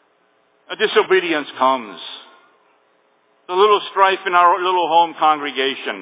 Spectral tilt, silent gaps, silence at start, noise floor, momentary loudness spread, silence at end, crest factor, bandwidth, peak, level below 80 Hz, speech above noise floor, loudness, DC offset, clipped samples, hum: -7 dB/octave; none; 0.7 s; -60 dBFS; 15 LU; 0 s; 18 dB; 4 kHz; 0 dBFS; -86 dBFS; 43 dB; -16 LUFS; under 0.1%; under 0.1%; none